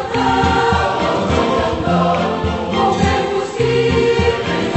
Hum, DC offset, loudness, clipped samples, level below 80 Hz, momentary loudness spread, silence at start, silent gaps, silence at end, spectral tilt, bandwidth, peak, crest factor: none; under 0.1%; -16 LUFS; under 0.1%; -32 dBFS; 4 LU; 0 s; none; 0 s; -6 dB/octave; 8.4 kHz; -2 dBFS; 14 dB